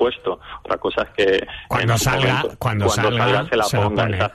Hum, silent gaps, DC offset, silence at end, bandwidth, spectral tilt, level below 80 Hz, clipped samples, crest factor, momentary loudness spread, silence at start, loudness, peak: none; none; under 0.1%; 0 s; 13.5 kHz; -4.5 dB/octave; -42 dBFS; under 0.1%; 14 dB; 7 LU; 0 s; -19 LUFS; -6 dBFS